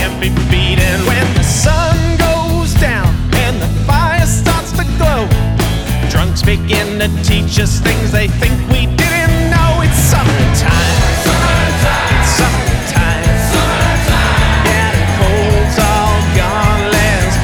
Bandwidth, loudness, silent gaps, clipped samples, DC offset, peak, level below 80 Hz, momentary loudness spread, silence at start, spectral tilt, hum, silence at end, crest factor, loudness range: 19.5 kHz; -12 LUFS; none; under 0.1%; under 0.1%; 0 dBFS; -16 dBFS; 3 LU; 0 s; -5 dB/octave; none; 0 s; 10 dB; 2 LU